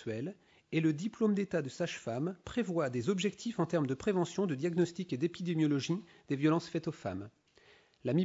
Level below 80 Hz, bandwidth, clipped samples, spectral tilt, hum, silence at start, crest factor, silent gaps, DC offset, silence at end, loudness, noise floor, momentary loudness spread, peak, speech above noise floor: -70 dBFS; 8 kHz; under 0.1%; -6.5 dB/octave; none; 0 s; 16 dB; none; under 0.1%; 0 s; -34 LUFS; -64 dBFS; 9 LU; -18 dBFS; 30 dB